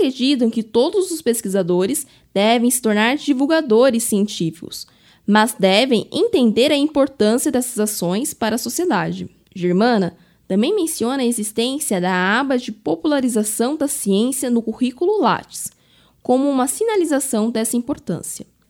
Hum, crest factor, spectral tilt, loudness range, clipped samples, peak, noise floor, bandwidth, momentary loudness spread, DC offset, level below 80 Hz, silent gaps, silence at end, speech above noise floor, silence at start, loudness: none; 18 dB; -4 dB/octave; 3 LU; under 0.1%; 0 dBFS; -55 dBFS; 17.5 kHz; 10 LU; under 0.1%; -60 dBFS; none; 0.25 s; 37 dB; 0 s; -18 LUFS